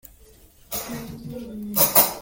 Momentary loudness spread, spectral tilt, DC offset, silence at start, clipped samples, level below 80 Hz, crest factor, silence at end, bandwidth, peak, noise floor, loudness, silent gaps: 20 LU; -2.5 dB/octave; under 0.1%; 0.7 s; under 0.1%; -52 dBFS; 24 dB; 0 s; 17 kHz; 0 dBFS; -51 dBFS; -19 LUFS; none